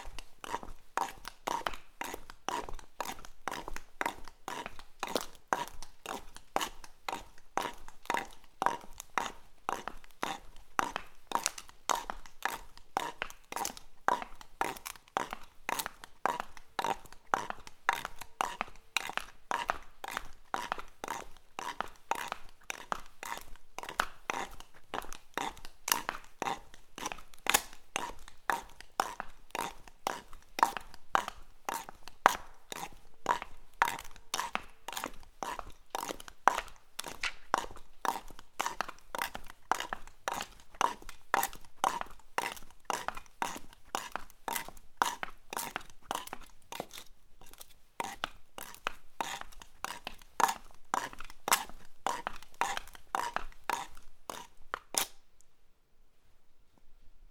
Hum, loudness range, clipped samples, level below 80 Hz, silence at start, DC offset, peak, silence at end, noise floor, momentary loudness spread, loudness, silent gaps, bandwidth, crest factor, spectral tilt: none; 5 LU; under 0.1%; -56 dBFS; 0 s; under 0.1%; 0 dBFS; 0 s; -59 dBFS; 13 LU; -38 LUFS; none; over 20 kHz; 38 dB; -1 dB/octave